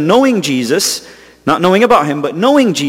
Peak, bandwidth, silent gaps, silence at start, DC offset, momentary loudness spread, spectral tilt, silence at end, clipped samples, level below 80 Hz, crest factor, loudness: 0 dBFS; 16.5 kHz; none; 0 s; under 0.1%; 7 LU; -4 dB/octave; 0 s; 0.1%; -52 dBFS; 12 dB; -12 LUFS